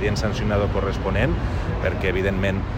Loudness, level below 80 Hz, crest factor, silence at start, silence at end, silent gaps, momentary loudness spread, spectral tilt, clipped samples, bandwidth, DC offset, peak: -23 LUFS; -28 dBFS; 14 dB; 0 s; 0 s; none; 3 LU; -6.5 dB/octave; under 0.1%; 15 kHz; under 0.1%; -8 dBFS